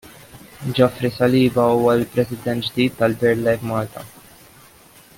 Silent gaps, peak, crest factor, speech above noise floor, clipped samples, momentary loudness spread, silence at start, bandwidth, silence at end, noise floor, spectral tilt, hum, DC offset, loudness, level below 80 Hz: none; -2 dBFS; 18 dB; 30 dB; under 0.1%; 11 LU; 0.05 s; 17 kHz; 1.1 s; -48 dBFS; -6.5 dB/octave; none; under 0.1%; -19 LUFS; -52 dBFS